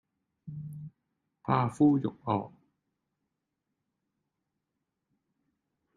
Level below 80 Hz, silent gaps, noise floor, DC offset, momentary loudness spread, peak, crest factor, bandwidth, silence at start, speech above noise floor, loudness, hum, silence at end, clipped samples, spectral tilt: -70 dBFS; none; -85 dBFS; under 0.1%; 21 LU; -12 dBFS; 24 dB; 10.5 kHz; 0.45 s; 57 dB; -28 LUFS; none; 3.5 s; under 0.1%; -8.5 dB/octave